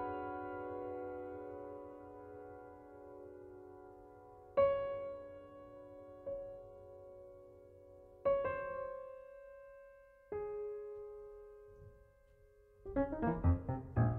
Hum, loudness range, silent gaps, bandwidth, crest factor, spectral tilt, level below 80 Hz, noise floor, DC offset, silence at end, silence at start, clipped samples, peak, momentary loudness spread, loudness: none; 9 LU; none; 4.2 kHz; 20 dB; -10.5 dB/octave; -56 dBFS; -66 dBFS; under 0.1%; 0 s; 0 s; under 0.1%; -22 dBFS; 23 LU; -41 LUFS